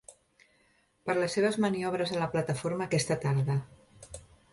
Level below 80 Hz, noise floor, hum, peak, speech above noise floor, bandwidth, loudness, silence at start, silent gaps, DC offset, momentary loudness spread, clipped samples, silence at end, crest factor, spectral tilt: -62 dBFS; -68 dBFS; none; -14 dBFS; 39 dB; 11.5 kHz; -30 LUFS; 0.1 s; none; under 0.1%; 19 LU; under 0.1%; 0.3 s; 16 dB; -5.5 dB/octave